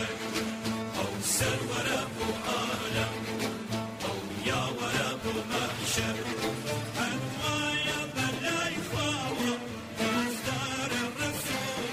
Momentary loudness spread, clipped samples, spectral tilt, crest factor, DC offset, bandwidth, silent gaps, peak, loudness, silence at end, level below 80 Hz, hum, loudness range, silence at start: 5 LU; under 0.1%; -3.5 dB/octave; 16 dB; under 0.1%; 16 kHz; none; -16 dBFS; -31 LUFS; 0 s; -58 dBFS; none; 1 LU; 0 s